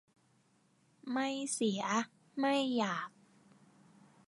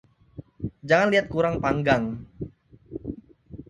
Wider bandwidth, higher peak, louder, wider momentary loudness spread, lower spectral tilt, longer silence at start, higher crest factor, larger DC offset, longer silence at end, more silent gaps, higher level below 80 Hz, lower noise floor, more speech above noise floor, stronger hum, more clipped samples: first, 11.5 kHz vs 10 kHz; second, -18 dBFS vs -4 dBFS; second, -35 LUFS vs -23 LUFS; second, 10 LU vs 20 LU; second, -3.5 dB/octave vs -6.5 dB/octave; first, 1.05 s vs 0.35 s; about the same, 20 dB vs 22 dB; neither; first, 1.2 s vs 0.05 s; neither; second, -90 dBFS vs -48 dBFS; first, -71 dBFS vs -46 dBFS; first, 37 dB vs 23 dB; neither; neither